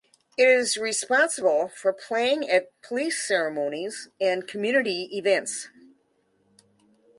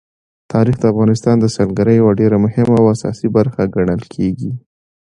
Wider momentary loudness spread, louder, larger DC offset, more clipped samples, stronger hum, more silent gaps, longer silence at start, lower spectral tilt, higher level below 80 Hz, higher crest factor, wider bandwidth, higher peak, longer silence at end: first, 12 LU vs 8 LU; second, -24 LUFS vs -14 LUFS; neither; neither; neither; neither; about the same, 0.4 s vs 0.5 s; second, -2 dB/octave vs -8 dB/octave; second, -78 dBFS vs -42 dBFS; about the same, 18 dB vs 14 dB; about the same, 11.5 kHz vs 10.5 kHz; second, -8 dBFS vs 0 dBFS; first, 1.5 s vs 0.55 s